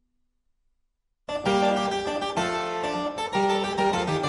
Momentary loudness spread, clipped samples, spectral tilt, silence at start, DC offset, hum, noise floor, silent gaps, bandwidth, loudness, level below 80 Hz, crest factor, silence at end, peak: 6 LU; under 0.1%; -4.5 dB/octave; 1.3 s; under 0.1%; none; -74 dBFS; none; 11.5 kHz; -26 LUFS; -56 dBFS; 16 dB; 0 s; -10 dBFS